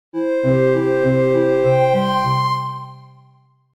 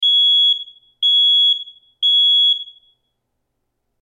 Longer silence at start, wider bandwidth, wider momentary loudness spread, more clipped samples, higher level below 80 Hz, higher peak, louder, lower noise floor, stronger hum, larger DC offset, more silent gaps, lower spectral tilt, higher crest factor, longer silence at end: first, 0.15 s vs 0 s; first, 12 kHz vs 10.5 kHz; about the same, 9 LU vs 10 LU; neither; first, -52 dBFS vs -76 dBFS; first, -4 dBFS vs -10 dBFS; second, -17 LUFS vs -12 LUFS; second, -53 dBFS vs -73 dBFS; neither; neither; neither; first, -7.5 dB/octave vs 4 dB/octave; about the same, 12 dB vs 8 dB; second, 0.75 s vs 1.4 s